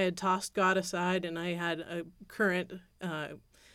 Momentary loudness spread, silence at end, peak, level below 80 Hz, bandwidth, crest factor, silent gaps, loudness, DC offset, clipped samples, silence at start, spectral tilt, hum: 14 LU; 0.35 s; -16 dBFS; -68 dBFS; 16 kHz; 16 dB; none; -32 LUFS; under 0.1%; under 0.1%; 0 s; -4.5 dB/octave; none